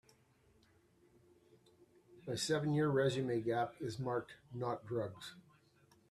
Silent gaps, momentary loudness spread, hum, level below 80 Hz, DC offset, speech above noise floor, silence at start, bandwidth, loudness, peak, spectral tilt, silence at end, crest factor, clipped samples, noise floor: none; 15 LU; none; -76 dBFS; under 0.1%; 33 dB; 2.1 s; 13.5 kHz; -38 LUFS; -22 dBFS; -5.5 dB/octave; 0.7 s; 18 dB; under 0.1%; -71 dBFS